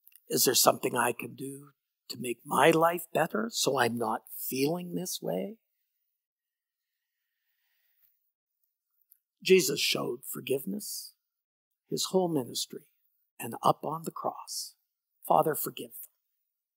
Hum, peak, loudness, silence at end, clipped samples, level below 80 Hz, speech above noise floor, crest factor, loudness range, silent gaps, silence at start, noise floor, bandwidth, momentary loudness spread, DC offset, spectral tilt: none; -6 dBFS; -29 LUFS; 0.7 s; under 0.1%; -88 dBFS; over 61 dB; 26 dB; 8 LU; 6.26-6.36 s, 8.35-8.47 s, 11.44-11.71 s, 13.31-13.37 s; 0.3 s; under -90 dBFS; 16.5 kHz; 18 LU; under 0.1%; -3 dB/octave